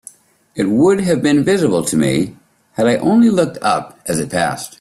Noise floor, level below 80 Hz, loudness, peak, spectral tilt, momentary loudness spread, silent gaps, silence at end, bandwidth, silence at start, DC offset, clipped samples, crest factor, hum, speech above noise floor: -43 dBFS; -52 dBFS; -15 LUFS; -2 dBFS; -5.5 dB/octave; 9 LU; none; 0.1 s; 14 kHz; 0.55 s; under 0.1%; under 0.1%; 12 dB; none; 28 dB